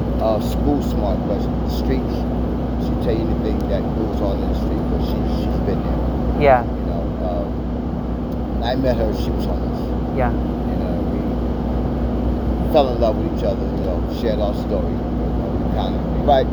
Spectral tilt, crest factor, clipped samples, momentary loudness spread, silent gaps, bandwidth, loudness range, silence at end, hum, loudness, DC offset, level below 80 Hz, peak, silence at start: -8.5 dB/octave; 18 dB; under 0.1%; 6 LU; none; 20 kHz; 2 LU; 0 s; none; -21 LUFS; under 0.1%; -24 dBFS; -2 dBFS; 0 s